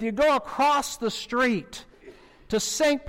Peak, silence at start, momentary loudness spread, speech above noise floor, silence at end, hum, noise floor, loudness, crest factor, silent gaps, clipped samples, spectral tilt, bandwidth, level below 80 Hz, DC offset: -16 dBFS; 0 s; 8 LU; 25 dB; 0 s; none; -50 dBFS; -24 LUFS; 10 dB; none; under 0.1%; -3 dB/octave; 16.5 kHz; -52 dBFS; under 0.1%